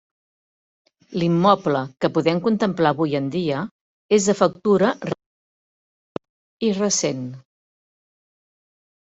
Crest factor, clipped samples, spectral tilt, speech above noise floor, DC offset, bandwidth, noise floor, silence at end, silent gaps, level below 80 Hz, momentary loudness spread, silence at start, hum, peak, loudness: 22 dB; under 0.1%; -5 dB/octave; over 70 dB; under 0.1%; 8.2 kHz; under -90 dBFS; 1.65 s; 3.71-4.09 s, 5.26-6.15 s, 6.29-6.60 s; -62 dBFS; 16 LU; 1.1 s; none; -2 dBFS; -21 LUFS